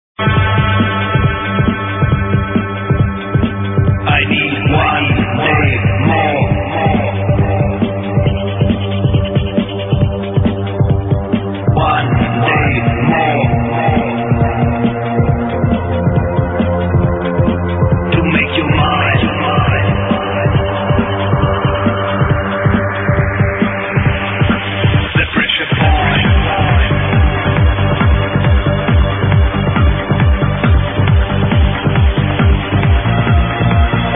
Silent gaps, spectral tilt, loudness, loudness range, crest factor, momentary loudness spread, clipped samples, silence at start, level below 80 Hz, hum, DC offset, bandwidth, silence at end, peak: none; -11 dB/octave; -13 LUFS; 2 LU; 12 dB; 3 LU; under 0.1%; 0.2 s; -22 dBFS; none; under 0.1%; 3.9 kHz; 0 s; 0 dBFS